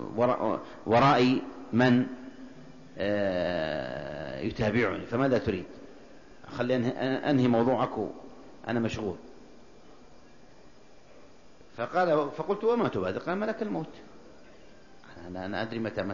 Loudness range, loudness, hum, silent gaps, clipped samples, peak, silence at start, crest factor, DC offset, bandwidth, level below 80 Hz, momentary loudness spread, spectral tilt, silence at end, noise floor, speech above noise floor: 9 LU; -28 LUFS; none; none; under 0.1%; -10 dBFS; 0 s; 20 dB; 0.3%; 7.4 kHz; -58 dBFS; 20 LU; -7 dB/octave; 0 s; -56 dBFS; 28 dB